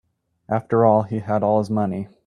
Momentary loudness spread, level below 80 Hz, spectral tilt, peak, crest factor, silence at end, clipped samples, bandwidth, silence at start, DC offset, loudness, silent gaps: 9 LU; -60 dBFS; -9.5 dB/octave; -2 dBFS; 18 dB; 0.2 s; under 0.1%; 10.5 kHz; 0.5 s; under 0.1%; -20 LUFS; none